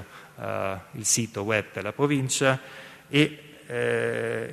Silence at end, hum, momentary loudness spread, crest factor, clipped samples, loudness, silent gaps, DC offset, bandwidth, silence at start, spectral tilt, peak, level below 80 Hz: 0 s; none; 14 LU; 22 dB; under 0.1%; -26 LUFS; none; under 0.1%; 13.5 kHz; 0 s; -3.5 dB/octave; -4 dBFS; -66 dBFS